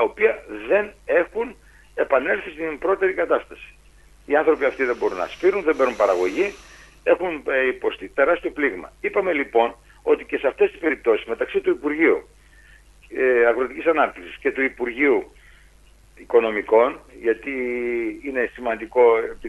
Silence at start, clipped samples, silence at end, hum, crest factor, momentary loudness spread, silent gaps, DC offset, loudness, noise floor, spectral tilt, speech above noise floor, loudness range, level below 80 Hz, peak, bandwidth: 0 s; under 0.1%; 0 s; none; 18 dB; 8 LU; none; under 0.1%; -21 LUFS; -51 dBFS; -5 dB/octave; 30 dB; 1 LU; -52 dBFS; -4 dBFS; 12 kHz